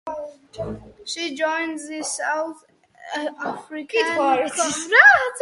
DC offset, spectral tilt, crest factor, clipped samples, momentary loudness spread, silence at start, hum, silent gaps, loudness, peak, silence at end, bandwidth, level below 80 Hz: under 0.1%; -2 dB/octave; 22 dB; under 0.1%; 21 LU; 0.05 s; none; none; -19 LUFS; 0 dBFS; 0 s; 11.5 kHz; -58 dBFS